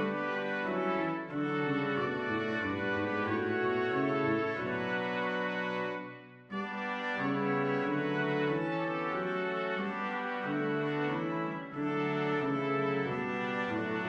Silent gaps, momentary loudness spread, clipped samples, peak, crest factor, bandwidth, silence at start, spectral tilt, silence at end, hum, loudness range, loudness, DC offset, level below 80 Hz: none; 4 LU; under 0.1%; -20 dBFS; 14 dB; 8 kHz; 0 s; -7.5 dB/octave; 0 s; none; 2 LU; -33 LUFS; under 0.1%; -72 dBFS